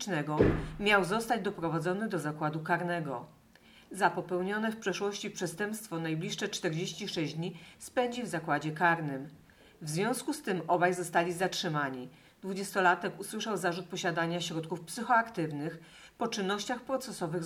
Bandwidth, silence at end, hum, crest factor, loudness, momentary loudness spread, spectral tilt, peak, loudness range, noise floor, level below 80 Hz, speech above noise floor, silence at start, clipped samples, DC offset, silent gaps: 17 kHz; 0 s; none; 22 dB; -32 LUFS; 11 LU; -4.5 dB/octave; -10 dBFS; 3 LU; -59 dBFS; -56 dBFS; 27 dB; 0 s; under 0.1%; under 0.1%; none